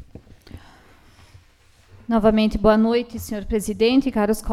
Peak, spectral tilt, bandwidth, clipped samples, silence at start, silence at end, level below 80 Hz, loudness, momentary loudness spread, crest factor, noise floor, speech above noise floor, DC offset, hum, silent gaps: -2 dBFS; -5.5 dB/octave; 15 kHz; under 0.1%; 0 s; 0 s; -38 dBFS; -20 LUFS; 11 LU; 20 dB; -54 dBFS; 35 dB; under 0.1%; none; none